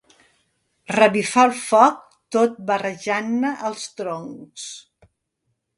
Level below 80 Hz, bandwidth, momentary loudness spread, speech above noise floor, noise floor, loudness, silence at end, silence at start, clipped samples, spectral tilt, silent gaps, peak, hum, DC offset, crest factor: -68 dBFS; 11.5 kHz; 19 LU; 55 dB; -75 dBFS; -20 LUFS; 1 s; 0.9 s; under 0.1%; -4 dB/octave; none; 0 dBFS; none; under 0.1%; 22 dB